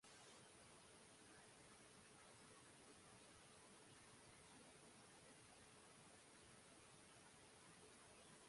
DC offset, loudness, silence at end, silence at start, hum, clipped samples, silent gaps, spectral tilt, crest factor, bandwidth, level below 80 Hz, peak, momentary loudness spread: under 0.1%; -65 LUFS; 0 s; 0 s; none; under 0.1%; none; -2.5 dB/octave; 16 dB; 11.5 kHz; -86 dBFS; -52 dBFS; 1 LU